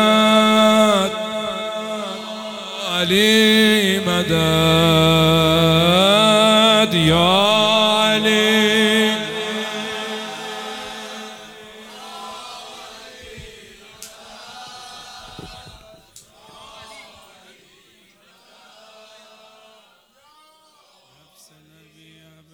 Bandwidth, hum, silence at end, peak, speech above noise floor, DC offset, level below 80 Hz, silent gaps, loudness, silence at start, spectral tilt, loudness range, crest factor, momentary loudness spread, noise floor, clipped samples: 17.5 kHz; none; 5.5 s; 0 dBFS; 40 dB; under 0.1%; -48 dBFS; none; -15 LUFS; 0 s; -4.5 dB/octave; 24 LU; 18 dB; 25 LU; -54 dBFS; under 0.1%